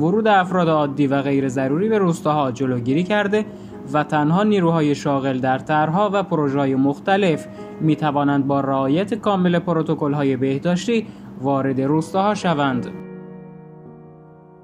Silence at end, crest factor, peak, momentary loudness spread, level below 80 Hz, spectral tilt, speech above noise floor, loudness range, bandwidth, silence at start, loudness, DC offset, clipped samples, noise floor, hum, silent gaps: 0.4 s; 16 dB; -4 dBFS; 7 LU; -58 dBFS; -7 dB/octave; 26 dB; 3 LU; 11 kHz; 0 s; -19 LUFS; under 0.1%; under 0.1%; -44 dBFS; none; none